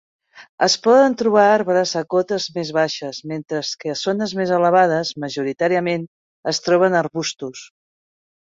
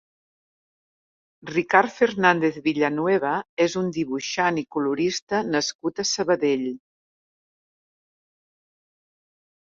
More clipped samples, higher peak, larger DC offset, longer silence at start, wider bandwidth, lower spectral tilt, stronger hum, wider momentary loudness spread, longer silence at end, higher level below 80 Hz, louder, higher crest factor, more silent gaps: neither; about the same, -2 dBFS vs -2 dBFS; neither; second, 0.35 s vs 1.45 s; about the same, 7.8 kHz vs 7.8 kHz; about the same, -4 dB/octave vs -4 dB/octave; neither; first, 13 LU vs 8 LU; second, 0.8 s vs 2.95 s; about the same, -64 dBFS vs -66 dBFS; first, -19 LUFS vs -23 LUFS; second, 18 dB vs 24 dB; first, 0.49-0.58 s, 6.08-6.43 s vs 3.49-3.57 s, 5.22-5.27 s, 5.75-5.79 s